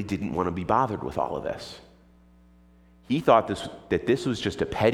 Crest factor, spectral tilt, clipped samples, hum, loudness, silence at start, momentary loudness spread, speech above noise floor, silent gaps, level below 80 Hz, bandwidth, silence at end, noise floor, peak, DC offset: 22 dB; -6 dB/octave; under 0.1%; none; -26 LUFS; 0 s; 13 LU; 30 dB; none; -52 dBFS; 15.5 kHz; 0 s; -56 dBFS; -6 dBFS; under 0.1%